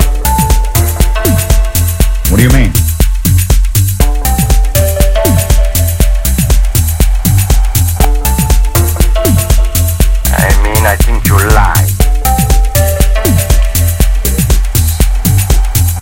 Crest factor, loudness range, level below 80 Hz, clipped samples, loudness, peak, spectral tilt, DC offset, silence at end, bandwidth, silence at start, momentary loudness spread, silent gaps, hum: 8 dB; 1 LU; -10 dBFS; 1%; -10 LUFS; 0 dBFS; -4.5 dB/octave; under 0.1%; 0 s; 17.5 kHz; 0 s; 3 LU; none; none